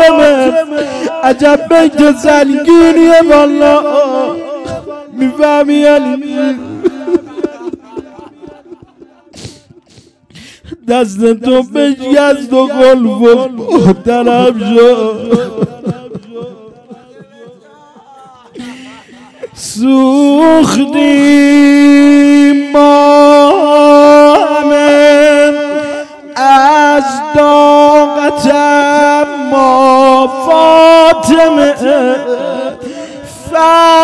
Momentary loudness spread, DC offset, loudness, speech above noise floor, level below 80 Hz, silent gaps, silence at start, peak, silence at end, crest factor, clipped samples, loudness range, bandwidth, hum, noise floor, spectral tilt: 16 LU; under 0.1%; -7 LUFS; 37 dB; -44 dBFS; none; 0 s; 0 dBFS; 0 s; 8 dB; 5%; 13 LU; 11 kHz; none; -43 dBFS; -5 dB/octave